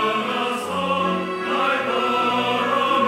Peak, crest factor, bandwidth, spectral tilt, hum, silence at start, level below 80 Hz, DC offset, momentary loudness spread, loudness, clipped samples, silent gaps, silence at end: -8 dBFS; 14 dB; 16 kHz; -4.5 dB/octave; none; 0 s; -70 dBFS; under 0.1%; 4 LU; -21 LUFS; under 0.1%; none; 0 s